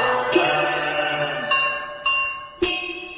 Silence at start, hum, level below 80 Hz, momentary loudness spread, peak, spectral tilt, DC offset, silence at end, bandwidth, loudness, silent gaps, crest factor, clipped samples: 0 s; none; -52 dBFS; 6 LU; -4 dBFS; -7.5 dB/octave; under 0.1%; 0 s; 4 kHz; -21 LUFS; none; 18 dB; under 0.1%